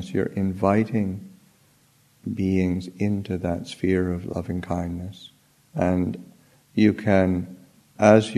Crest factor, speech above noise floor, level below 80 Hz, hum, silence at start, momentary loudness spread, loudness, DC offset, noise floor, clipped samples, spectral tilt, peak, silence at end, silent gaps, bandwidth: 22 dB; 37 dB; -52 dBFS; none; 0 s; 14 LU; -24 LUFS; under 0.1%; -60 dBFS; under 0.1%; -7.5 dB/octave; -2 dBFS; 0 s; none; 13 kHz